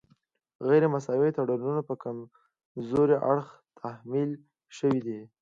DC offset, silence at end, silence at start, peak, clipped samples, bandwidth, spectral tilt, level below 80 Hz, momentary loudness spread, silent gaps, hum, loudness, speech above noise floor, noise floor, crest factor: under 0.1%; 0.15 s; 0.6 s; -12 dBFS; under 0.1%; 7.6 kHz; -8.5 dB/octave; -68 dBFS; 18 LU; 2.65-2.75 s; none; -28 LUFS; 41 dB; -68 dBFS; 18 dB